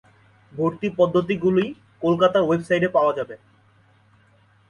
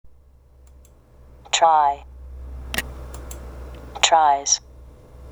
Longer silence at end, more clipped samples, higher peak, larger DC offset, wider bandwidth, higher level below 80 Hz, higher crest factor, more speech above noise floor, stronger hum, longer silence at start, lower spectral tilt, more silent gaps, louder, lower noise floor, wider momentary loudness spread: first, 1.35 s vs 0 s; neither; second, -6 dBFS vs 0 dBFS; neither; second, 11 kHz vs over 20 kHz; second, -60 dBFS vs -40 dBFS; second, 18 dB vs 24 dB; first, 37 dB vs 33 dB; neither; first, 0.55 s vs 0.05 s; first, -7.5 dB/octave vs -1 dB/octave; neither; about the same, -21 LUFS vs -19 LUFS; first, -57 dBFS vs -51 dBFS; second, 12 LU vs 23 LU